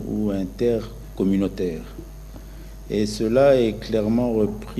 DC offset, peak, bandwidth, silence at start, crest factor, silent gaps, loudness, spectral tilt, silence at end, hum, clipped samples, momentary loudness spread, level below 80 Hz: under 0.1%; -6 dBFS; 13.5 kHz; 0 s; 18 dB; none; -22 LUFS; -7 dB/octave; 0 s; none; under 0.1%; 23 LU; -38 dBFS